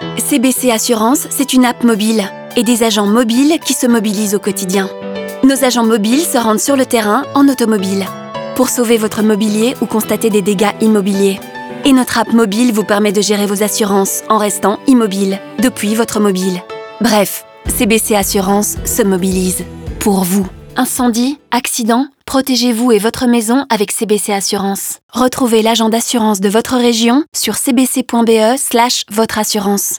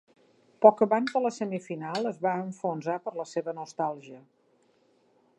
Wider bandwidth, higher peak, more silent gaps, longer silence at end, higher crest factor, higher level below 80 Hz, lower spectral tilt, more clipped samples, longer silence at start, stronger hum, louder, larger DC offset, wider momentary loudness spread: first, over 20 kHz vs 9.4 kHz; first, 0 dBFS vs -4 dBFS; first, 25.03-25.09 s, 27.28-27.32 s vs none; second, 0 s vs 1.2 s; second, 12 dB vs 26 dB; first, -40 dBFS vs -84 dBFS; second, -4 dB/octave vs -6 dB/octave; neither; second, 0 s vs 0.6 s; neither; first, -13 LUFS vs -28 LUFS; neither; second, 6 LU vs 13 LU